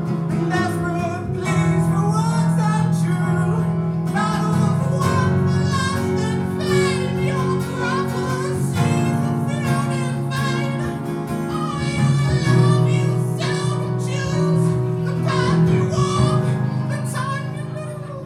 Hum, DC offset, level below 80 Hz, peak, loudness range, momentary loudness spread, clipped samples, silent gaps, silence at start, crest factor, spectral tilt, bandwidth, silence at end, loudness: none; under 0.1%; -46 dBFS; -4 dBFS; 2 LU; 6 LU; under 0.1%; none; 0 s; 16 dB; -6.5 dB/octave; 14 kHz; 0 s; -20 LUFS